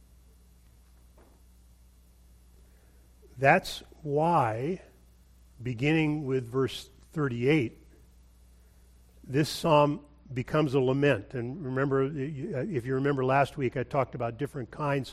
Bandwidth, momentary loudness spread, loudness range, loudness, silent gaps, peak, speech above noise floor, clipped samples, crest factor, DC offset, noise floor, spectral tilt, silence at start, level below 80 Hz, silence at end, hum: 14.5 kHz; 13 LU; 4 LU; -29 LUFS; none; -6 dBFS; 30 dB; under 0.1%; 24 dB; under 0.1%; -57 dBFS; -6.5 dB/octave; 3.35 s; -56 dBFS; 0 s; none